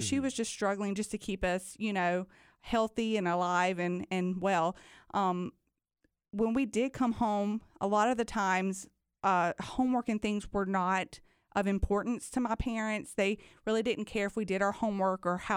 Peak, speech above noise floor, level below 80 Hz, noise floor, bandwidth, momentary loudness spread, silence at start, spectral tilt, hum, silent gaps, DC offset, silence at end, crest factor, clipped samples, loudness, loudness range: -16 dBFS; 46 dB; -50 dBFS; -78 dBFS; 16 kHz; 6 LU; 0 s; -5 dB/octave; none; none; under 0.1%; 0 s; 16 dB; under 0.1%; -32 LUFS; 2 LU